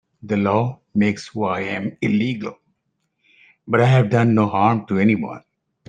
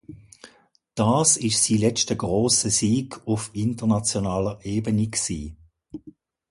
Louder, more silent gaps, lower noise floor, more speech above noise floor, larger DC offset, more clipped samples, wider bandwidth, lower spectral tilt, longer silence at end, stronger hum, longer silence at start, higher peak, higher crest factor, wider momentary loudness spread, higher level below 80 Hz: first, -19 LUFS vs -22 LUFS; neither; first, -73 dBFS vs -59 dBFS; first, 54 dB vs 36 dB; neither; neither; second, 9 kHz vs 11.5 kHz; first, -8 dB/octave vs -4 dB/octave; about the same, 0.5 s vs 0.4 s; neither; first, 0.25 s vs 0.1 s; first, -2 dBFS vs -6 dBFS; about the same, 18 dB vs 18 dB; second, 10 LU vs 17 LU; second, -60 dBFS vs -48 dBFS